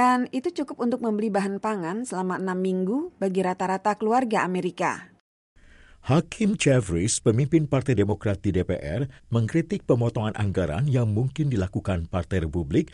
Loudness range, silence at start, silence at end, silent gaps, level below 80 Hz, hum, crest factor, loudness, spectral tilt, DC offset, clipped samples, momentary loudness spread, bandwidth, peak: 3 LU; 0 s; 0.05 s; 5.21-5.56 s; -46 dBFS; none; 16 dB; -25 LUFS; -6.5 dB/octave; under 0.1%; under 0.1%; 6 LU; 11.5 kHz; -8 dBFS